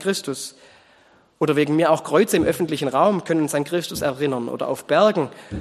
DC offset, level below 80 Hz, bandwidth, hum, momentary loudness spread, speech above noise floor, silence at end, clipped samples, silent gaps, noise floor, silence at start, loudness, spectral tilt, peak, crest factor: under 0.1%; -54 dBFS; 13 kHz; none; 9 LU; 35 dB; 0 s; under 0.1%; none; -55 dBFS; 0 s; -21 LUFS; -5 dB/octave; -4 dBFS; 18 dB